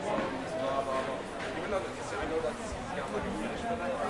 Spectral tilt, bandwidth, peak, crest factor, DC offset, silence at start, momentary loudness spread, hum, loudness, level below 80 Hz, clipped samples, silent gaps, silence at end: -5 dB/octave; 11.5 kHz; -18 dBFS; 16 dB; under 0.1%; 0 s; 4 LU; none; -34 LUFS; -52 dBFS; under 0.1%; none; 0 s